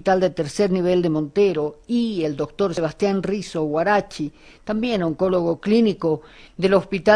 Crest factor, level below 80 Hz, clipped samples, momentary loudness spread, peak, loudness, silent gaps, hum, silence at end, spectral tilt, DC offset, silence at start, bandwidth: 18 dB; -50 dBFS; under 0.1%; 8 LU; -4 dBFS; -21 LUFS; none; none; 0 s; -6.5 dB/octave; under 0.1%; 0.05 s; 11 kHz